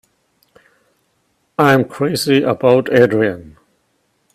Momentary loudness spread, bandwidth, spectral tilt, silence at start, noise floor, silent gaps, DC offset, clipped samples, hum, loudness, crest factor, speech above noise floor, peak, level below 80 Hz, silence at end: 7 LU; 15.5 kHz; -6 dB/octave; 1.6 s; -64 dBFS; none; under 0.1%; under 0.1%; none; -14 LUFS; 16 dB; 50 dB; 0 dBFS; -56 dBFS; 0.85 s